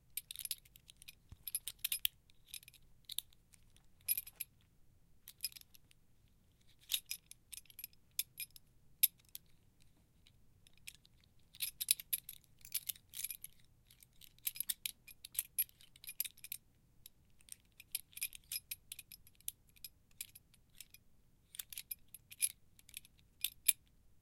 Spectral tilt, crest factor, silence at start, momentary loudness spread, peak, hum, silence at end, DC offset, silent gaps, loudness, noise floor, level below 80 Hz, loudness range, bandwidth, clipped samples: 2 dB/octave; 38 dB; 0.1 s; 23 LU; -10 dBFS; none; 0.45 s; under 0.1%; none; -41 LUFS; -70 dBFS; -72 dBFS; 7 LU; 16.5 kHz; under 0.1%